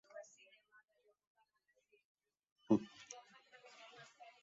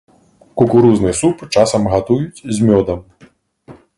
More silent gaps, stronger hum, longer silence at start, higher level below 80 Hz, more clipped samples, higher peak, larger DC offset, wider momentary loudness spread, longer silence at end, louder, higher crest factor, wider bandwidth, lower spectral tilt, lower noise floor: first, 1.27-1.35 s, 2.05-2.15 s, 2.52-2.56 s vs none; neither; second, 0.15 s vs 0.55 s; second, -86 dBFS vs -40 dBFS; neither; second, -22 dBFS vs 0 dBFS; neither; first, 24 LU vs 11 LU; about the same, 0.2 s vs 0.25 s; second, -39 LUFS vs -14 LUFS; first, 26 dB vs 16 dB; second, 7.6 kHz vs 11.5 kHz; about the same, -6.5 dB/octave vs -6 dB/octave; first, -82 dBFS vs -48 dBFS